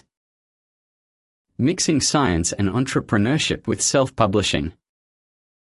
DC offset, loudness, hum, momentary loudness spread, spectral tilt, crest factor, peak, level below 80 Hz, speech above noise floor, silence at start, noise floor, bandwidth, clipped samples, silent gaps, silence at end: under 0.1%; -20 LUFS; none; 5 LU; -4 dB/octave; 20 dB; -2 dBFS; -42 dBFS; over 70 dB; 1.6 s; under -90 dBFS; 11.5 kHz; under 0.1%; none; 1 s